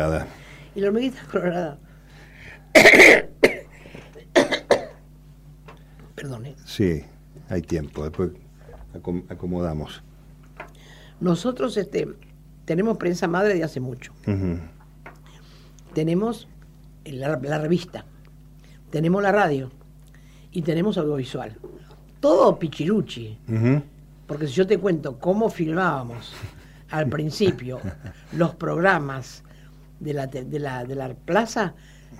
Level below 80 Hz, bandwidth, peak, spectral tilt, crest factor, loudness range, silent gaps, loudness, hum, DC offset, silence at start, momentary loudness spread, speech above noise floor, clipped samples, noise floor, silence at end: -48 dBFS; 16 kHz; -2 dBFS; -5.5 dB/octave; 22 dB; 14 LU; none; -21 LUFS; none; under 0.1%; 0 s; 18 LU; 25 dB; under 0.1%; -47 dBFS; 0 s